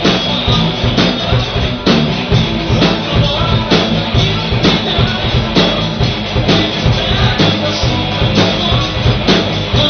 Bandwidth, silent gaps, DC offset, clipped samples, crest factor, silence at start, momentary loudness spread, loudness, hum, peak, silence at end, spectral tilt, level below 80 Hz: 6.6 kHz; none; under 0.1%; under 0.1%; 12 dB; 0 s; 3 LU; -12 LUFS; none; 0 dBFS; 0 s; -4 dB/octave; -24 dBFS